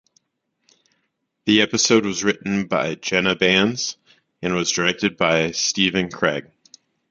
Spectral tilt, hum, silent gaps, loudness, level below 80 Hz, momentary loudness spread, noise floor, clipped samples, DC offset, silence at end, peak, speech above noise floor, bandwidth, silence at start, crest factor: -3 dB/octave; none; none; -19 LUFS; -56 dBFS; 8 LU; -74 dBFS; under 0.1%; under 0.1%; 0.7 s; -2 dBFS; 54 dB; 9.4 kHz; 1.45 s; 20 dB